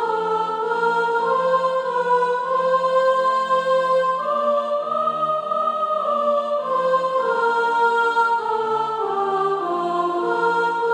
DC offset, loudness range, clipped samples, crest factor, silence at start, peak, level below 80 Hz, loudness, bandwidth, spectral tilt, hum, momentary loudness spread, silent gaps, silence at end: under 0.1%; 2 LU; under 0.1%; 12 dB; 0 s; -8 dBFS; -72 dBFS; -20 LUFS; 10.5 kHz; -4.5 dB/octave; none; 4 LU; none; 0 s